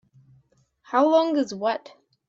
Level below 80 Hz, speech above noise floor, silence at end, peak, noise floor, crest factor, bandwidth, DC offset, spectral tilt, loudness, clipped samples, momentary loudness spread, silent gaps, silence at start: -76 dBFS; 41 dB; 0.5 s; -6 dBFS; -63 dBFS; 18 dB; 7.6 kHz; under 0.1%; -5 dB/octave; -23 LUFS; under 0.1%; 8 LU; none; 0.9 s